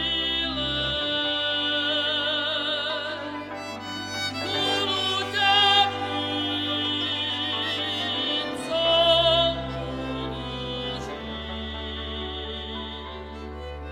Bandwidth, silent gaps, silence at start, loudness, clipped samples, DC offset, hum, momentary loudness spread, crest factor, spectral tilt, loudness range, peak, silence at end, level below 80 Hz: 16.5 kHz; none; 0 s; -24 LUFS; under 0.1%; under 0.1%; none; 15 LU; 20 dB; -3.5 dB/octave; 9 LU; -6 dBFS; 0 s; -44 dBFS